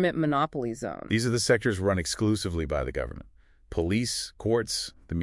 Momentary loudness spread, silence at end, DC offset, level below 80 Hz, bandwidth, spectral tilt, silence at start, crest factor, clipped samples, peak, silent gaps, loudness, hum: 10 LU; 0 s; under 0.1%; -46 dBFS; 12 kHz; -4.5 dB/octave; 0 s; 18 dB; under 0.1%; -10 dBFS; none; -28 LUFS; none